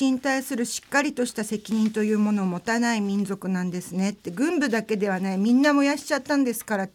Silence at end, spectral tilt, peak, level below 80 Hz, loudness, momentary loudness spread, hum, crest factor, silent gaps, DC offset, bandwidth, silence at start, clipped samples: 0.05 s; -5 dB/octave; -8 dBFS; -68 dBFS; -24 LUFS; 7 LU; none; 16 dB; none; under 0.1%; 17 kHz; 0 s; under 0.1%